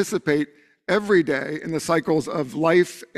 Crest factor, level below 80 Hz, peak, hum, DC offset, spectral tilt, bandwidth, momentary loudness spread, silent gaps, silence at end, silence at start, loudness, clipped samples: 16 dB; -60 dBFS; -6 dBFS; none; under 0.1%; -5.5 dB/octave; 14 kHz; 8 LU; none; 0.1 s; 0 s; -22 LUFS; under 0.1%